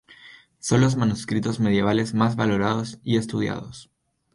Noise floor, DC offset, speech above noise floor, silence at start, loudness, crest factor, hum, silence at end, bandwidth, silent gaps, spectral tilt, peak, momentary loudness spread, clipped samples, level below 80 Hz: -49 dBFS; under 0.1%; 27 dB; 0.1 s; -23 LUFS; 18 dB; none; 0.5 s; 11.5 kHz; none; -6 dB/octave; -6 dBFS; 8 LU; under 0.1%; -52 dBFS